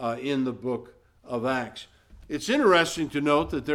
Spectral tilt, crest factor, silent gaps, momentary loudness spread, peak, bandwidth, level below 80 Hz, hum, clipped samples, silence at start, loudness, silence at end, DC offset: -4.5 dB/octave; 20 dB; none; 15 LU; -8 dBFS; 16 kHz; -52 dBFS; none; under 0.1%; 0 s; -26 LUFS; 0 s; under 0.1%